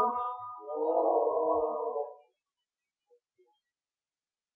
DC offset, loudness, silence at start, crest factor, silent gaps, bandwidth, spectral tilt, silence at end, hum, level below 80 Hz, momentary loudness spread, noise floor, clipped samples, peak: under 0.1%; -31 LUFS; 0 s; 18 dB; none; 3.8 kHz; -6 dB/octave; 2.4 s; none; -76 dBFS; 12 LU; under -90 dBFS; under 0.1%; -16 dBFS